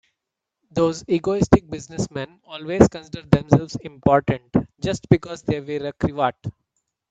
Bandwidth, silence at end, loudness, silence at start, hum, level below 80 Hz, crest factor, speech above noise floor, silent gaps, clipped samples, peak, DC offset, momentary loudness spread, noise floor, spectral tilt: 9 kHz; 0.6 s; -21 LUFS; 0.75 s; none; -42 dBFS; 22 dB; 62 dB; none; under 0.1%; 0 dBFS; under 0.1%; 15 LU; -83 dBFS; -7 dB/octave